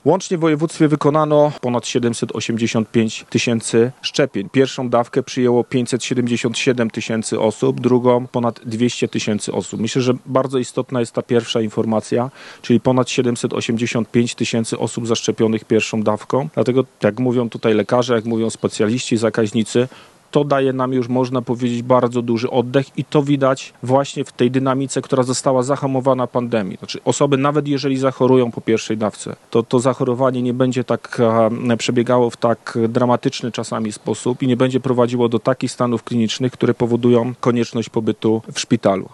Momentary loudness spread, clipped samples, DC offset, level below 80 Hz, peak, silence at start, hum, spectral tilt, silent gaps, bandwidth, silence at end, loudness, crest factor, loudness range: 6 LU; under 0.1%; under 0.1%; -64 dBFS; 0 dBFS; 0.05 s; none; -5.5 dB/octave; none; 11.5 kHz; 0.05 s; -18 LUFS; 16 dB; 1 LU